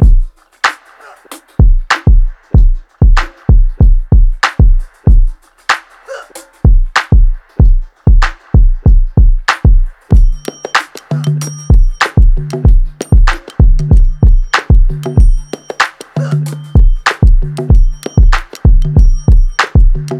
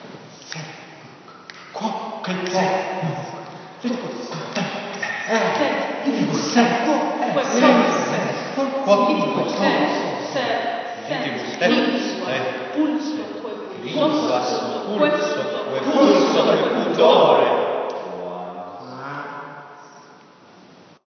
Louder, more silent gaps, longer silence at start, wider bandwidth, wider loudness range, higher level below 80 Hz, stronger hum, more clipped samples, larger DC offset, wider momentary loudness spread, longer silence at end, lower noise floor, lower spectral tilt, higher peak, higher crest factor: first, -12 LUFS vs -20 LUFS; neither; about the same, 0 s vs 0 s; first, 9.8 kHz vs 6.8 kHz; second, 2 LU vs 8 LU; first, -8 dBFS vs -76 dBFS; neither; neither; first, 0.3% vs under 0.1%; second, 7 LU vs 18 LU; second, 0 s vs 0.95 s; second, -38 dBFS vs -48 dBFS; first, -6 dB/octave vs -4.5 dB/octave; about the same, 0 dBFS vs 0 dBFS; second, 8 dB vs 20 dB